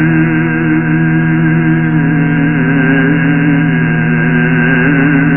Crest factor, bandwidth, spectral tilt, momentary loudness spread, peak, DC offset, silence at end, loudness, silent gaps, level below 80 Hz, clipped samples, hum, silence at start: 8 dB; 3.1 kHz; -11.5 dB/octave; 2 LU; -2 dBFS; 1%; 0 s; -10 LUFS; none; -36 dBFS; under 0.1%; none; 0 s